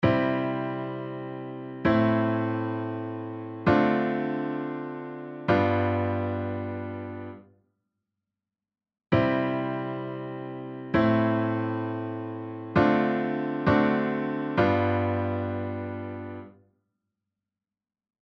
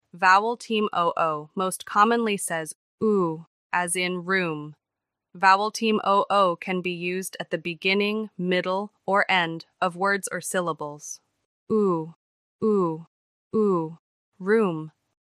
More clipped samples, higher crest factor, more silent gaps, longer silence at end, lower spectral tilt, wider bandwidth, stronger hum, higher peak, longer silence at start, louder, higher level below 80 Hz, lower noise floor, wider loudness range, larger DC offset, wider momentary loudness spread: neither; about the same, 22 dB vs 20 dB; second, none vs 2.75-2.98 s, 3.47-3.70 s, 11.45-11.67 s, 12.16-12.59 s, 13.07-13.51 s, 13.99-14.32 s; first, 1.75 s vs 0.35 s; first, -9 dB/octave vs -4 dB/octave; second, 6.2 kHz vs 15 kHz; neither; about the same, -6 dBFS vs -4 dBFS; second, 0 s vs 0.15 s; second, -27 LUFS vs -24 LUFS; first, -56 dBFS vs -78 dBFS; first, under -90 dBFS vs -86 dBFS; about the same, 6 LU vs 4 LU; neither; about the same, 14 LU vs 14 LU